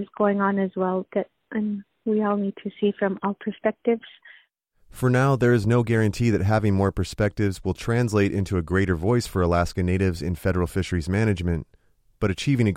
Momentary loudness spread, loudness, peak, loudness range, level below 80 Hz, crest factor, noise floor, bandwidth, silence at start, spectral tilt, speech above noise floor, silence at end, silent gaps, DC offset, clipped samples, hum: 8 LU; -24 LUFS; -8 dBFS; 4 LU; -42 dBFS; 16 dB; -61 dBFS; 15.5 kHz; 0 s; -7 dB/octave; 38 dB; 0 s; none; under 0.1%; under 0.1%; none